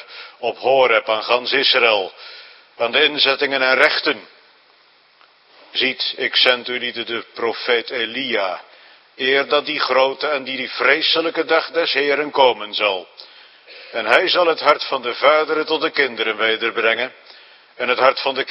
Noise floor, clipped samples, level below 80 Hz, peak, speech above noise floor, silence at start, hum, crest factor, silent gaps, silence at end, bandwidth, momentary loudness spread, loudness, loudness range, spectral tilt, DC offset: -54 dBFS; under 0.1%; -74 dBFS; 0 dBFS; 35 dB; 0 s; none; 20 dB; none; 0 s; 10 kHz; 11 LU; -17 LUFS; 4 LU; -3.5 dB/octave; under 0.1%